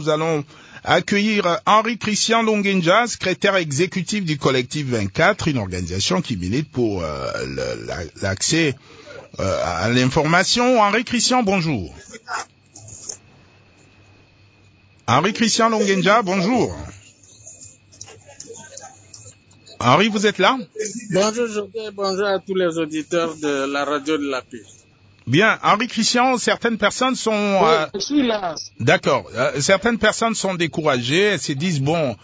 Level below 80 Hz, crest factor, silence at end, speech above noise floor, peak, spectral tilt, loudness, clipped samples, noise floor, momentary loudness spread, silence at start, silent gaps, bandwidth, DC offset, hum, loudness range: -46 dBFS; 18 dB; 0.1 s; 33 dB; -2 dBFS; -4 dB/octave; -19 LUFS; under 0.1%; -52 dBFS; 18 LU; 0 s; none; 8 kHz; under 0.1%; none; 5 LU